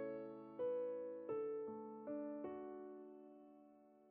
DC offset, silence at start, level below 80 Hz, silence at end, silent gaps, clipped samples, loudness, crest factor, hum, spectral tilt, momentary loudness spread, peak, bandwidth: under 0.1%; 0 s; -88 dBFS; 0 s; none; under 0.1%; -48 LUFS; 12 dB; none; -7.5 dB/octave; 19 LU; -36 dBFS; 3.6 kHz